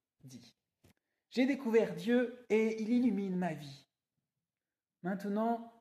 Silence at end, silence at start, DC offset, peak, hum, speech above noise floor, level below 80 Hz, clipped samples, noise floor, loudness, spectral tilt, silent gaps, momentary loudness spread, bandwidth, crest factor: 0.1 s; 0.25 s; under 0.1%; -18 dBFS; none; over 57 dB; -82 dBFS; under 0.1%; under -90 dBFS; -34 LUFS; -7 dB/octave; none; 10 LU; 14 kHz; 18 dB